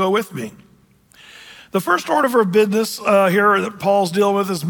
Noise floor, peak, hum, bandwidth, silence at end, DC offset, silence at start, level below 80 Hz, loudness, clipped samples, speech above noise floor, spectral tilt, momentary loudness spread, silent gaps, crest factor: -53 dBFS; -4 dBFS; none; 19.5 kHz; 0 s; under 0.1%; 0 s; -64 dBFS; -17 LUFS; under 0.1%; 36 dB; -5 dB/octave; 10 LU; none; 14 dB